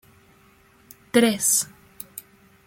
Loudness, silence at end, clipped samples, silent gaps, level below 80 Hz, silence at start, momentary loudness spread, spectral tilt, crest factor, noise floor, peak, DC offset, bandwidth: -20 LUFS; 0.45 s; under 0.1%; none; -64 dBFS; 1.15 s; 22 LU; -2.5 dB/octave; 22 dB; -56 dBFS; -4 dBFS; under 0.1%; 16.5 kHz